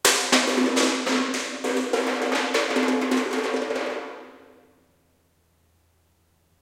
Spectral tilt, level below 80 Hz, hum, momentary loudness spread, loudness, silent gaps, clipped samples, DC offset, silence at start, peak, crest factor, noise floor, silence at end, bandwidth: -1 dB/octave; -72 dBFS; none; 9 LU; -23 LUFS; none; under 0.1%; under 0.1%; 0.05 s; -6 dBFS; 20 dB; -65 dBFS; 2.25 s; 17 kHz